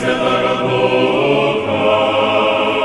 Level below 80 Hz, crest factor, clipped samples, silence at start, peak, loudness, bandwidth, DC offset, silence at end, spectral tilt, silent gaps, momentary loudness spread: -48 dBFS; 12 dB; under 0.1%; 0 s; -2 dBFS; -14 LUFS; 11.5 kHz; under 0.1%; 0 s; -5.5 dB/octave; none; 2 LU